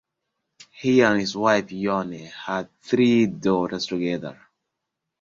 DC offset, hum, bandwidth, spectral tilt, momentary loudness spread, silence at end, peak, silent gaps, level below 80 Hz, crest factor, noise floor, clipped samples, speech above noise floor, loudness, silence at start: under 0.1%; none; 7.6 kHz; -5.5 dB/octave; 12 LU; 0.9 s; -4 dBFS; none; -60 dBFS; 20 dB; -82 dBFS; under 0.1%; 60 dB; -22 LUFS; 0.75 s